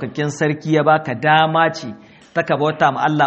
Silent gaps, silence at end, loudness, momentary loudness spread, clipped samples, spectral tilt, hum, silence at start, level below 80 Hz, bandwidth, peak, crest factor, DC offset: none; 0 s; -17 LUFS; 10 LU; under 0.1%; -6 dB/octave; none; 0 s; -60 dBFS; 8.2 kHz; 0 dBFS; 16 dB; under 0.1%